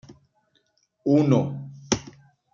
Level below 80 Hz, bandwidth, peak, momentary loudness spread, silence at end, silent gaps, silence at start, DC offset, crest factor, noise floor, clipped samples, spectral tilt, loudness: -58 dBFS; 7.6 kHz; -6 dBFS; 12 LU; 0.5 s; none; 0.1 s; under 0.1%; 20 dB; -68 dBFS; under 0.1%; -6 dB/octave; -23 LUFS